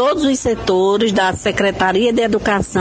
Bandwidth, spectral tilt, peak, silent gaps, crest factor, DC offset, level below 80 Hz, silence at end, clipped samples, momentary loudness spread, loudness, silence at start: 9.8 kHz; -4.5 dB/octave; 0 dBFS; none; 14 dB; under 0.1%; -38 dBFS; 0 s; under 0.1%; 3 LU; -16 LUFS; 0 s